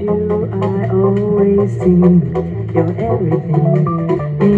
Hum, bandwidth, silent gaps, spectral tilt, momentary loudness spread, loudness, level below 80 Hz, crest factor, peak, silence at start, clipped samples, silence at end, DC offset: none; 4.4 kHz; none; -11 dB/octave; 6 LU; -14 LUFS; -42 dBFS; 14 dB; 0 dBFS; 0 s; under 0.1%; 0 s; under 0.1%